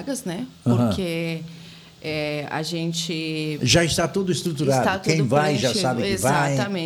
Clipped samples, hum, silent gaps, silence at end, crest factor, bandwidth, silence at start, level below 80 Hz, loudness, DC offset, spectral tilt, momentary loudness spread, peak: under 0.1%; none; none; 0 s; 18 dB; 19 kHz; 0 s; -48 dBFS; -22 LUFS; under 0.1%; -4.5 dB/octave; 10 LU; -4 dBFS